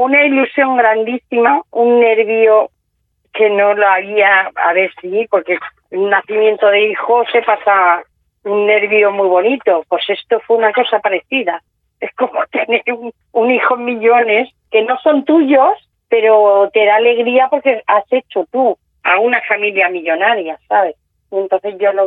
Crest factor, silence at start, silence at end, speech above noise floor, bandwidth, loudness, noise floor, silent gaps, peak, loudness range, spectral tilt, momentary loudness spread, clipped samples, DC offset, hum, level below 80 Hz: 12 dB; 0 s; 0 s; 53 dB; 4 kHz; -13 LUFS; -65 dBFS; none; 0 dBFS; 4 LU; -7.5 dB/octave; 9 LU; under 0.1%; under 0.1%; none; -66 dBFS